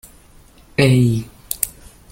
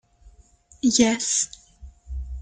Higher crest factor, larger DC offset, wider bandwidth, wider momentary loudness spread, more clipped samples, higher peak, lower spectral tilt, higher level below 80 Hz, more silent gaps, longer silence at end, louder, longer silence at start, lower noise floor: about the same, 20 dB vs 20 dB; neither; first, 17 kHz vs 9.6 kHz; second, 12 LU vs 18 LU; neither; first, 0 dBFS vs -6 dBFS; first, -5.5 dB/octave vs -2.5 dB/octave; about the same, -44 dBFS vs -40 dBFS; neither; first, 0.4 s vs 0 s; first, -18 LUFS vs -21 LUFS; first, 0.8 s vs 0.25 s; second, -47 dBFS vs -54 dBFS